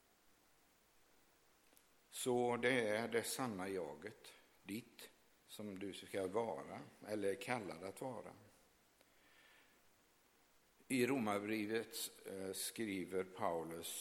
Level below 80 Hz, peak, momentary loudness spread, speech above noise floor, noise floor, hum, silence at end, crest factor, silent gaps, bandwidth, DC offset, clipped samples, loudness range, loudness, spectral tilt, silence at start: -84 dBFS; -22 dBFS; 16 LU; 31 dB; -74 dBFS; none; 0 s; 22 dB; none; 19 kHz; under 0.1%; under 0.1%; 7 LU; -43 LUFS; -4 dB/octave; 2.1 s